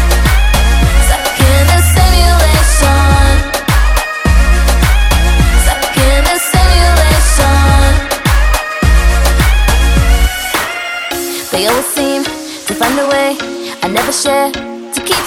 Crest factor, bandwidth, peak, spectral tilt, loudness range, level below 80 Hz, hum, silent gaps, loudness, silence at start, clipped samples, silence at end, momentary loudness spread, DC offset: 10 dB; 17 kHz; 0 dBFS; -4 dB/octave; 5 LU; -12 dBFS; none; none; -11 LUFS; 0 s; 0.3%; 0 s; 8 LU; under 0.1%